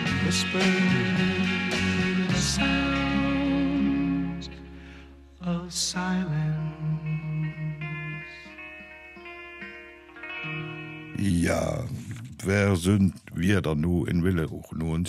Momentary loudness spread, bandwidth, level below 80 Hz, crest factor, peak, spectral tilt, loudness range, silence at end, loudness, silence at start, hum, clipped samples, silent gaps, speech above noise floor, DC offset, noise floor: 17 LU; 14 kHz; -44 dBFS; 16 dB; -10 dBFS; -5 dB/octave; 11 LU; 0 s; -26 LUFS; 0 s; none; under 0.1%; none; 23 dB; under 0.1%; -47 dBFS